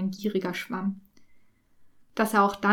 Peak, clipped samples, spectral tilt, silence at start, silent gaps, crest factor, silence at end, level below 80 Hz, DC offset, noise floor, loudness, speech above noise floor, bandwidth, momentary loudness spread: -8 dBFS; under 0.1%; -5.5 dB/octave; 0 s; none; 20 dB; 0 s; -66 dBFS; under 0.1%; -58 dBFS; -27 LUFS; 33 dB; 19 kHz; 13 LU